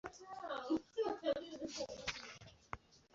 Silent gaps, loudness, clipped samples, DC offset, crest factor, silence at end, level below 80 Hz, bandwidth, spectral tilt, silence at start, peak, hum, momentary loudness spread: none; -44 LUFS; under 0.1%; under 0.1%; 20 dB; 0.15 s; -68 dBFS; 7.6 kHz; -2.5 dB/octave; 0.05 s; -24 dBFS; none; 14 LU